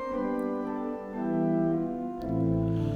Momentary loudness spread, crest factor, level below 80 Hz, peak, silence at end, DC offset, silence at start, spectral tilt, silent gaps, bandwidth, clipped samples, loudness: 7 LU; 14 dB; -50 dBFS; -16 dBFS; 0 s; under 0.1%; 0 s; -10 dB/octave; none; 6.6 kHz; under 0.1%; -30 LUFS